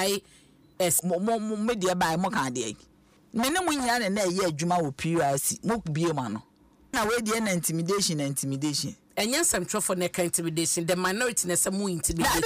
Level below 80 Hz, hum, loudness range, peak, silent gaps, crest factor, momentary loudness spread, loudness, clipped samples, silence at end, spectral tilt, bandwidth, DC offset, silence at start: -52 dBFS; none; 2 LU; -14 dBFS; none; 14 dB; 6 LU; -27 LUFS; under 0.1%; 0 s; -3.5 dB/octave; 16 kHz; under 0.1%; 0 s